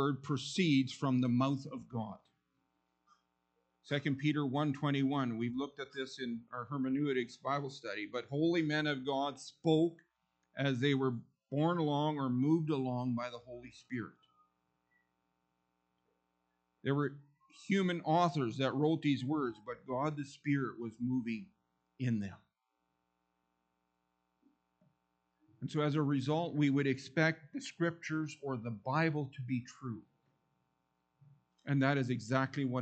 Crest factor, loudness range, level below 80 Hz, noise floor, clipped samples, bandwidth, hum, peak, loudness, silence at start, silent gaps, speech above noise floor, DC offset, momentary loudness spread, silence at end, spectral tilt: 20 dB; 10 LU; -78 dBFS; -84 dBFS; under 0.1%; 8.8 kHz; none; -16 dBFS; -35 LUFS; 0 s; none; 49 dB; under 0.1%; 12 LU; 0 s; -6.5 dB/octave